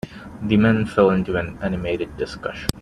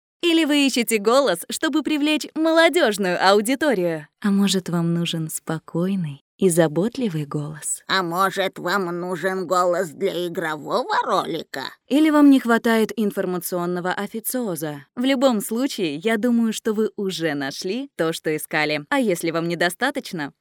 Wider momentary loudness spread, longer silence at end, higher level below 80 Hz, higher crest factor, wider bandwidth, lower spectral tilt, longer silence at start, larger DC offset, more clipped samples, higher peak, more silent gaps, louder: about the same, 11 LU vs 10 LU; about the same, 0 s vs 0.1 s; first, -42 dBFS vs -70 dBFS; about the same, 20 dB vs 20 dB; second, 15 kHz vs 19 kHz; first, -6.5 dB/octave vs -4.5 dB/octave; second, 0.05 s vs 0.25 s; neither; neither; about the same, 0 dBFS vs -2 dBFS; second, none vs 6.21-6.39 s; about the same, -21 LUFS vs -21 LUFS